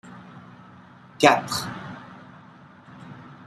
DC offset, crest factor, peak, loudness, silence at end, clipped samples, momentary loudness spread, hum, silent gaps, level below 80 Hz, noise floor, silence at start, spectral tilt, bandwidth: under 0.1%; 26 dB; -2 dBFS; -21 LUFS; 0.1 s; under 0.1%; 27 LU; none; none; -64 dBFS; -49 dBFS; 0.05 s; -3.5 dB/octave; 15 kHz